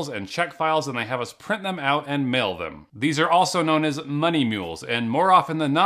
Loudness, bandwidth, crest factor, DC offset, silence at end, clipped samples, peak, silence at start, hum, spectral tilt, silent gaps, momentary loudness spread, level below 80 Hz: -22 LUFS; 15 kHz; 18 dB; under 0.1%; 0 s; under 0.1%; -4 dBFS; 0 s; none; -5 dB/octave; none; 10 LU; -64 dBFS